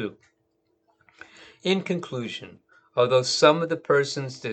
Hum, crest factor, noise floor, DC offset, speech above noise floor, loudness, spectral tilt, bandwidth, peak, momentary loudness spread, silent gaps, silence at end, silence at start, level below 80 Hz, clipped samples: none; 22 dB; -71 dBFS; under 0.1%; 47 dB; -24 LUFS; -4.5 dB/octave; 9 kHz; -4 dBFS; 14 LU; none; 0 s; 0 s; -74 dBFS; under 0.1%